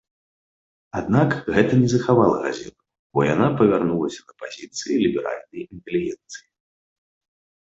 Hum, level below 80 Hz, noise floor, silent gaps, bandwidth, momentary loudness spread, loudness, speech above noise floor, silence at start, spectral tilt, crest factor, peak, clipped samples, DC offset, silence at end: none; -54 dBFS; under -90 dBFS; 2.99-3.10 s; 8 kHz; 18 LU; -21 LUFS; over 69 dB; 0.95 s; -6.5 dB/octave; 20 dB; -4 dBFS; under 0.1%; under 0.1%; 1.35 s